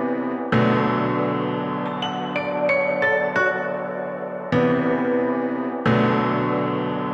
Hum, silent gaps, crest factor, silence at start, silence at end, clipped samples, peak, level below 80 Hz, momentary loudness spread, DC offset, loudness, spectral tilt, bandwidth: none; none; 14 dB; 0 s; 0 s; under 0.1%; -8 dBFS; -58 dBFS; 7 LU; under 0.1%; -22 LUFS; -7.5 dB/octave; 7.4 kHz